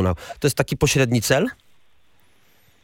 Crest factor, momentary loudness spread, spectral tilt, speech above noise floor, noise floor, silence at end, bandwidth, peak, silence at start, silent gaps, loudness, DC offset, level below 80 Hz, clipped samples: 20 dB; 6 LU; -4.5 dB/octave; 42 dB; -62 dBFS; 1.3 s; 17 kHz; -2 dBFS; 0 s; none; -20 LUFS; under 0.1%; -44 dBFS; under 0.1%